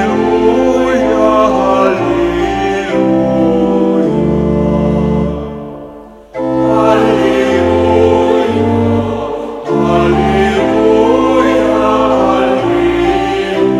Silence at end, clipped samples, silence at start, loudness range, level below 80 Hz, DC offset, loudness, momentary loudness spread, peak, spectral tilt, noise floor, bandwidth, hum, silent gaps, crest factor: 0 s; 0.1%; 0 s; 3 LU; -30 dBFS; under 0.1%; -11 LUFS; 7 LU; 0 dBFS; -7 dB/octave; -32 dBFS; 11.5 kHz; none; none; 10 dB